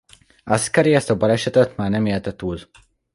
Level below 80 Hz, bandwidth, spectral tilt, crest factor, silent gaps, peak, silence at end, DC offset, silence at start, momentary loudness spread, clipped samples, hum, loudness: -46 dBFS; 11.5 kHz; -5.5 dB/octave; 18 dB; none; -2 dBFS; 0.5 s; under 0.1%; 0.45 s; 12 LU; under 0.1%; none; -19 LUFS